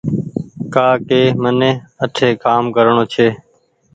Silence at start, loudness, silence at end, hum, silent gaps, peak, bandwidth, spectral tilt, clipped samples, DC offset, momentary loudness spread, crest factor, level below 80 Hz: 0.05 s; -15 LUFS; 0.6 s; none; none; 0 dBFS; 9 kHz; -6.5 dB/octave; under 0.1%; under 0.1%; 9 LU; 14 dB; -52 dBFS